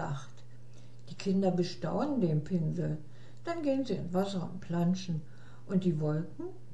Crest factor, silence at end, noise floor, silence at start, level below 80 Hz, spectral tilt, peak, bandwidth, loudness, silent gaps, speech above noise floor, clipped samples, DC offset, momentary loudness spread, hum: 14 dB; 0 s; -53 dBFS; 0 s; -64 dBFS; -7.5 dB/octave; -18 dBFS; 12 kHz; -33 LUFS; none; 21 dB; under 0.1%; 0.8%; 15 LU; none